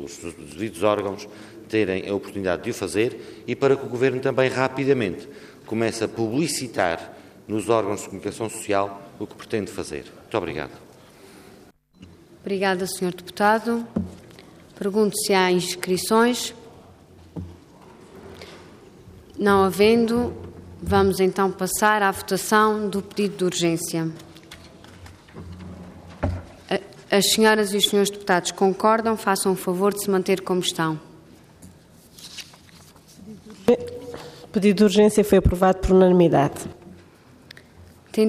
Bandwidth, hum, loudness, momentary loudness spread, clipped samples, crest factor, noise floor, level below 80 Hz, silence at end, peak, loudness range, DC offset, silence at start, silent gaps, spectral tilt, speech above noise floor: 15.5 kHz; none; -22 LUFS; 22 LU; under 0.1%; 18 dB; -51 dBFS; -44 dBFS; 0 s; -4 dBFS; 10 LU; under 0.1%; 0 s; none; -4.5 dB/octave; 30 dB